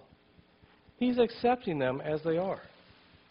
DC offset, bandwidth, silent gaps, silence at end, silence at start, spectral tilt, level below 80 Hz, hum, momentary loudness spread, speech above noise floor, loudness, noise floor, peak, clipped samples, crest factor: under 0.1%; 5.4 kHz; none; 0.65 s; 1 s; -9.5 dB/octave; -64 dBFS; none; 6 LU; 32 dB; -31 LUFS; -62 dBFS; -14 dBFS; under 0.1%; 18 dB